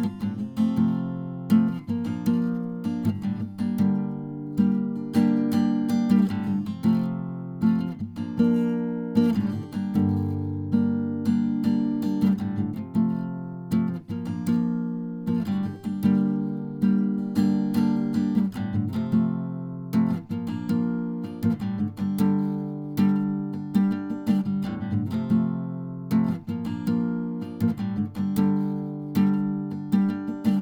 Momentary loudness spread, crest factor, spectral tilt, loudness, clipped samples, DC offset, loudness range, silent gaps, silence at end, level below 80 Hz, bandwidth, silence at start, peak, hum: 8 LU; 16 dB; -8.5 dB/octave; -26 LUFS; under 0.1%; under 0.1%; 3 LU; none; 0 s; -62 dBFS; 18 kHz; 0 s; -8 dBFS; none